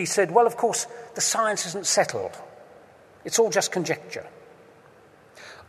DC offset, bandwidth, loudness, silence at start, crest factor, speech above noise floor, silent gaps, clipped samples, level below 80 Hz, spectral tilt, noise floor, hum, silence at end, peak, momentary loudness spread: under 0.1%; 13.5 kHz; -23 LUFS; 0 s; 22 dB; 29 dB; none; under 0.1%; -74 dBFS; -2 dB/octave; -53 dBFS; none; 0.05 s; -4 dBFS; 17 LU